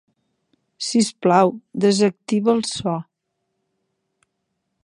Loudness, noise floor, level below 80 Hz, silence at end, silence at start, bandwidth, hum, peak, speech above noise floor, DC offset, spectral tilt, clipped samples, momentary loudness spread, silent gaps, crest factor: -20 LUFS; -76 dBFS; -64 dBFS; 1.85 s; 0.8 s; 11 kHz; none; -2 dBFS; 57 dB; under 0.1%; -5 dB/octave; under 0.1%; 9 LU; none; 20 dB